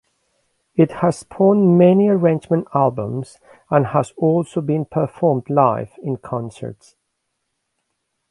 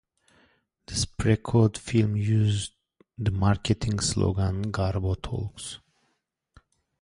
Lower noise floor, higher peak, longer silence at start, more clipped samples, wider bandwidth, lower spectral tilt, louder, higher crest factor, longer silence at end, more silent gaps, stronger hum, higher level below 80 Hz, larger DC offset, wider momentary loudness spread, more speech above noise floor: about the same, -74 dBFS vs -76 dBFS; first, 0 dBFS vs -8 dBFS; second, 0.75 s vs 0.9 s; neither; about the same, 11.5 kHz vs 11.5 kHz; first, -9 dB/octave vs -5.5 dB/octave; first, -18 LUFS vs -26 LUFS; about the same, 18 dB vs 18 dB; first, 1.55 s vs 1.25 s; neither; neither; second, -58 dBFS vs -42 dBFS; neither; first, 14 LU vs 11 LU; first, 57 dB vs 51 dB